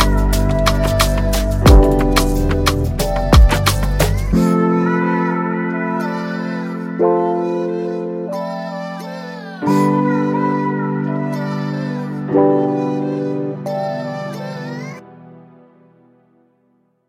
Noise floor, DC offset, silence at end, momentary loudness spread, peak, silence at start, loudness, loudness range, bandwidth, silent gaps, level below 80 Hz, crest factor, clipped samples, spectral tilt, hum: -60 dBFS; under 0.1%; 1.65 s; 12 LU; 0 dBFS; 0 s; -17 LUFS; 8 LU; 16.5 kHz; none; -22 dBFS; 16 dB; under 0.1%; -6 dB/octave; none